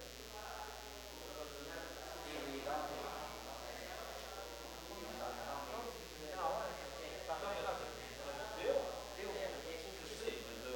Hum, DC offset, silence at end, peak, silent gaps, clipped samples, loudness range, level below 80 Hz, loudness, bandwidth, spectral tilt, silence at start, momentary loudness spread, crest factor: none; under 0.1%; 0 s; -26 dBFS; none; under 0.1%; 4 LU; -60 dBFS; -45 LUFS; 17 kHz; -3 dB/octave; 0 s; 8 LU; 20 dB